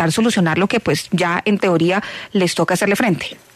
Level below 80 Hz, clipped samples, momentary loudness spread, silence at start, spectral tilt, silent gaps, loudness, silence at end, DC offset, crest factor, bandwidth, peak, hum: -54 dBFS; under 0.1%; 3 LU; 0 s; -5 dB/octave; none; -17 LUFS; 0.2 s; under 0.1%; 14 dB; 13.5 kHz; -4 dBFS; none